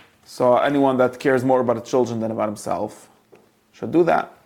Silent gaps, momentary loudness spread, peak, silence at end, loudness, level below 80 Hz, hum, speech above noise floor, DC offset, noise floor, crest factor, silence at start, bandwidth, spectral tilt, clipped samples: none; 9 LU; -4 dBFS; 0.15 s; -20 LUFS; -62 dBFS; none; 34 dB; under 0.1%; -54 dBFS; 16 dB; 0.3 s; 17 kHz; -6.5 dB/octave; under 0.1%